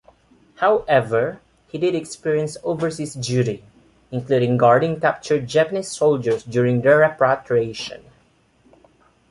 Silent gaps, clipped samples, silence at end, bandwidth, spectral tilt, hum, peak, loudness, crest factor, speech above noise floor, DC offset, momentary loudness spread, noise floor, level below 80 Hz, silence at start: none; under 0.1%; 1.35 s; 11.5 kHz; -6 dB/octave; none; -2 dBFS; -20 LUFS; 18 dB; 39 dB; under 0.1%; 12 LU; -58 dBFS; -58 dBFS; 0.6 s